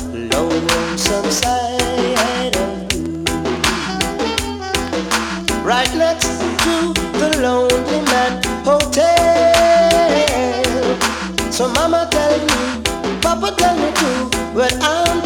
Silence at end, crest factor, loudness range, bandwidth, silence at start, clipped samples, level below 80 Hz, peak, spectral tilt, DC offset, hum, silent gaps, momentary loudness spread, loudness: 0 s; 16 dB; 5 LU; 19.5 kHz; 0 s; under 0.1%; -34 dBFS; 0 dBFS; -3 dB/octave; under 0.1%; none; none; 7 LU; -16 LUFS